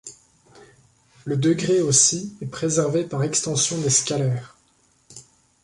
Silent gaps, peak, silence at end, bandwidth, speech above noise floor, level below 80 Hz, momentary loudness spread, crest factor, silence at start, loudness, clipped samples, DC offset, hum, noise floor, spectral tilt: none; -4 dBFS; 0.4 s; 11.5 kHz; 40 dB; -60 dBFS; 14 LU; 20 dB; 0.05 s; -20 LUFS; under 0.1%; under 0.1%; none; -62 dBFS; -4 dB/octave